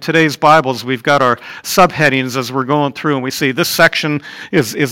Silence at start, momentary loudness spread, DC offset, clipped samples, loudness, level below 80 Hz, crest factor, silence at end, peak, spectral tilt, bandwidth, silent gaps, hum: 0 s; 8 LU; under 0.1%; under 0.1%; -13 LUFS; -50 dBFS; 14 dB; 0 s; 0 dBFS; -4.5 dB/octave; 17 kHz; none; none